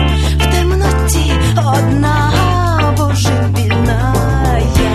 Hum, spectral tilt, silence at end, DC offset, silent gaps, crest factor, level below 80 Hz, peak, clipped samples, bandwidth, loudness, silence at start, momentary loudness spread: none; -5.5 dB/octave; 0 s; under 0.1%; none; 12 dB; -18 dBFS; 0 dBFS; under 0.1%; 13.5 kHz; -13 LUFS; 0 s; 1 LU